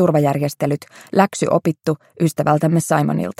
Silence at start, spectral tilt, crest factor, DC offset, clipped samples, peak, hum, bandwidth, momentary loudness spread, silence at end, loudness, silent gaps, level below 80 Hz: 0 s; -6.5 dB/octave; 16 dB; under 0.1%; under 0.1%; 0 dBFS; none; 16 kHz; 6 LU; 0.1 s; -18 LUFS; none; -60 dBFS